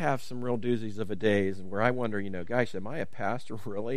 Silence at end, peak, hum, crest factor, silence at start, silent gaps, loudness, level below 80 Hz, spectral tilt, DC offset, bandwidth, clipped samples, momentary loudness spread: 0 s; -8 dBFS; none; 22 dB; 0 s; none; -31 LUFS; -64 dBFS; -7 dB/octave; 2%; 15 kHz; under 0.1%; 9 LU